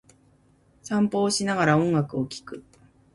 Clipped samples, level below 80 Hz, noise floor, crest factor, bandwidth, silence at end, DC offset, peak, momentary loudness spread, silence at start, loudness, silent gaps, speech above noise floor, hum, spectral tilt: under 0.1%; -60 dBFS; -60 dBFS; 20 dB; 11.5 kHz; 0.55 s; under 0.1%; -6 dBFS; 21 LU; 0.85 s; -24 LUFS; none; 37 dB; none; -5 dB/octave